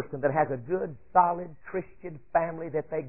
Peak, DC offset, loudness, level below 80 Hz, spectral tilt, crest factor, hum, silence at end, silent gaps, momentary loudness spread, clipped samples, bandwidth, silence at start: -8 dBFS; 0.4%; -29 LUFS; -60 dBFS; -13 dB/octave; 20 dB; none; 0 s; none; 12 LU; under 0.1%; 2.9 kHz; 0 s